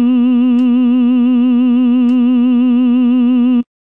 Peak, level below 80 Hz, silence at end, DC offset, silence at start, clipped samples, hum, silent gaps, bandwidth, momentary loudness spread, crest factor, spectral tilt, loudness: -6 dBFS; -70 dBFS; 0.3 s; 0.6%; 0 s; under 0.1%; none; none; 3.6 kHz; 0 LU; 4 dB; -8.5 dB/octave; -11 LUFS